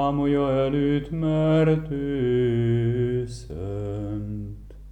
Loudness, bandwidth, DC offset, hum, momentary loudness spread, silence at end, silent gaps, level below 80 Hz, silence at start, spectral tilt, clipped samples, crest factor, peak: -24 LUFS; 9.8 kHz; under 0.1%; none; 13 LU; 0 s; none; -42 dBFS; 0 s; -8.5 dB/octave; under 0.1%; 14 dB; -8 dBFS